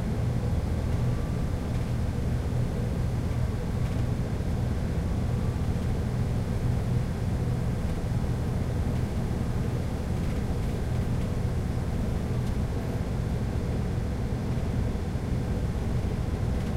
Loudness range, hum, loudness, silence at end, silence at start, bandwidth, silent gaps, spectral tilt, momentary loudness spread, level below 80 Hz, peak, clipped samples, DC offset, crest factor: 1 LU; none; -30 LUFS; 0 s; 0 s; 15 kHz; none; -7.5 dB/octave; 2 LU; -32 dBFS; -16 dBFS; under 0.1%; under 0.1%; 12 dB